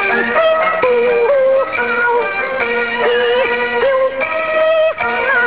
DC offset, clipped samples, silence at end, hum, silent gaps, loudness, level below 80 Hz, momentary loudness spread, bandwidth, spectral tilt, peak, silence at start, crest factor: 0.6%; under 0.1%; 0 s; none; none; -14 LUFS; -52 dBFS; 3 LU; 4 kHz; -6.5 dB/octave; -2 dBFS; 0 s; 12 dB